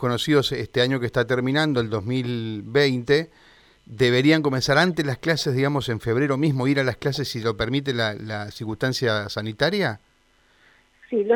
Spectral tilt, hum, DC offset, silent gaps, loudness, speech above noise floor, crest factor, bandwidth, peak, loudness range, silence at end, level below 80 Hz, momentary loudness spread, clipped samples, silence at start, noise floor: -5.5 dB/octave; none; under 0.1%; none; -22 LUFS; 38 dB; 18 dB; 18 kHz; -4 dBFS; 4 LU; 0 s; -52 dBFS; 8 LU; under 0.1%; 0 s; -61 dBFS